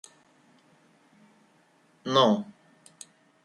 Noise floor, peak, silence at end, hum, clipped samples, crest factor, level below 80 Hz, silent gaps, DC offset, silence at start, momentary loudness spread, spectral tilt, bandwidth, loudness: -63 dBFS; -8 dBFS; 1 s; none; under 0.1%; 22 dB; -80 dBFS; none; under 0.1%; 2.05 s; 27 LU; -5 dB/octave; 11.5 kHz; -24 LUFS